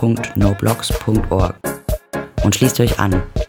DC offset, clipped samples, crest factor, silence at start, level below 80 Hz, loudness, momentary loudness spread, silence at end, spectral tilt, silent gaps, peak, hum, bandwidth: under 0.1%; under 0.1%; 16 dB; 0 s; -26 dBFS; -18 LUFS; 10 LU; 0.05 s; -5.5 dB/octave; none; 0 dBFS; none; 19 kHz